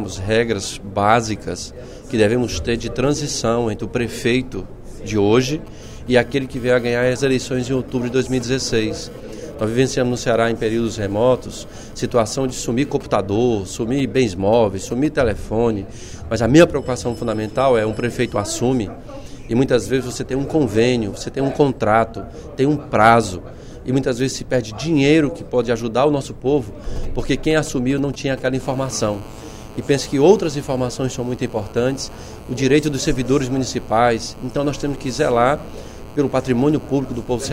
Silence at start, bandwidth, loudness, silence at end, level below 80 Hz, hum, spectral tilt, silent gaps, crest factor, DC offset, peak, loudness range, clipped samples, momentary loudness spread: 0 s; 16 kHz; -19 LUFS; 0 s; -36 dBFS; none; -5.5 dB/octave; none; 18 dB; under 0.1%; 0 dBFS; 3 LU; under 0.1%; 13 LU